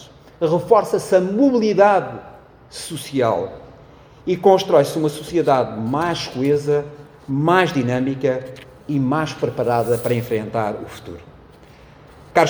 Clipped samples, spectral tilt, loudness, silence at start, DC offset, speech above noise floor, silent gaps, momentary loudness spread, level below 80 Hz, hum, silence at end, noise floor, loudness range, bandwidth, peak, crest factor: under 0.1%; -6 dB/octave; -19 LUFS; 0 s; under 0.1%; 27 dB; none; 18 LU; -52 dBFS; none; 0 s; -45 dBFS; 4 LU; over 20 kHz; 0 dBFS; 18 dB